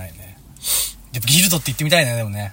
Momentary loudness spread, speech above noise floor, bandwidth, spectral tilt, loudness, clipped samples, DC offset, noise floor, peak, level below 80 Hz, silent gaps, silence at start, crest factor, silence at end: 12 LU; 23 dB; 16.5 kHz; -3 dB/octave; -17 LUFS; under 0.1%; under 0.1%; -40 dBFS; 0 dBFS; -44 dBFS; none; 0 s; 20 dB; 0 s